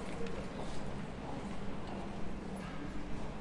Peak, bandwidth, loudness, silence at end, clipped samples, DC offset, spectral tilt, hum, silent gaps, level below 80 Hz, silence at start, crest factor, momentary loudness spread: -26 dBFS; 11.5 kHz; -44 LUFS; 0 s; under 0.1%; 0.2%; -6 dB/octave; none; none; -50 dBFS; 0 s; 12 dB; 2 LU